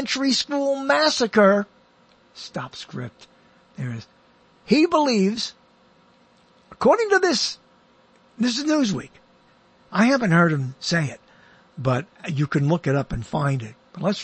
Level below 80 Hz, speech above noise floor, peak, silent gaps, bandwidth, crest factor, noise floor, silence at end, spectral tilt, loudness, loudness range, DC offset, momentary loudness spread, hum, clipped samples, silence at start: -52 dBFS; 36 dB; -4 dBFS; none; 8.8 kHz; 20 dB; -57 dBFS; 0 s; -5 dB/octave; -21 LUFS; 3 LU; under 0.1%; 16 LU; none; under 0.1%; 0 s